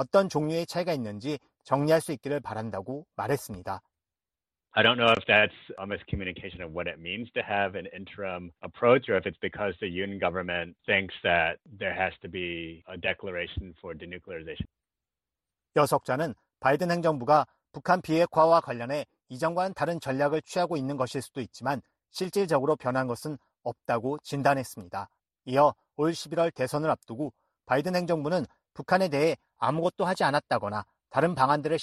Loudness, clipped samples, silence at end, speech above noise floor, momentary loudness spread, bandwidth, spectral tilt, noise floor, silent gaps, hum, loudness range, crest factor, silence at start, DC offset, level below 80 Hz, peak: -28 LUFS; under 0.1%; 0 s; over 62 dB; 15 LU; 13 kHz; -5.5 dB/octave; under -90 dBFS; none; none; 5 LU; 20 dB; 0 s; under 0.1%; -58 dBFS; -8 dBFS